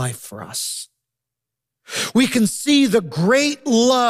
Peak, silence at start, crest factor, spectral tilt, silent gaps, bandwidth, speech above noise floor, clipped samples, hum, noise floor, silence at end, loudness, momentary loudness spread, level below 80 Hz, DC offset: -6 dBFS; 0 s; 14 dB; -4 dB/octave; none; 15 kHz; 66 dB; under 0.1%; none; -84 dBFS; 0 s; -18 LUFS; 13 LU; -64 dBFS; under 0.1%